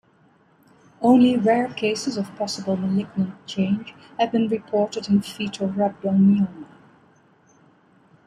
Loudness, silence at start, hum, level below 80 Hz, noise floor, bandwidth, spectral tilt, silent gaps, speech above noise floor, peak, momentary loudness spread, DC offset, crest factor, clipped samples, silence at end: -22 LUFS; 1 s; none; -64 dBFS; -58 dBFS; 11.5 kHz; -6.5 dB/octave; none; 37 dB; -4 dBFS; 10 LU; under 0.1%; 18 dB; under 0.1%; 1.65 s